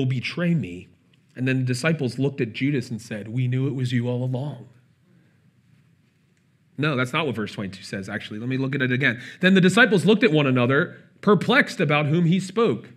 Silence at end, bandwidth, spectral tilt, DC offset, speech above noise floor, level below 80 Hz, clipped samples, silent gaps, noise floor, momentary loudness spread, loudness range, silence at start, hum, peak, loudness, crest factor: 0.1 s; 13 kHz; -6.5 dB/octave; under 0.1%; 40 dB; -72 dBFS; under 0.1%; none; -62 dBFS; 14 LU; 11 LU; 0 s; none; -2 dBFS; -22 LUFS; 20 dB